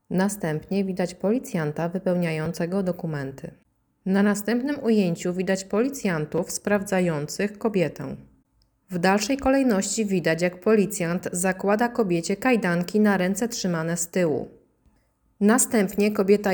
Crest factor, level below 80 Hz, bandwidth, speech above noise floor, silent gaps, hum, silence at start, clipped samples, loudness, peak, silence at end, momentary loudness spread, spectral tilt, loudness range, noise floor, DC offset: 18 dB; -56 dBFS; over 20 kHz; 42 dB; none; none; 0.1 s; under 0.1%; -24 LUFS; -6 dBFS; 0 s; 7 LU; -5 dB/octave; 4 LU; -65 dBFS; under 0.1%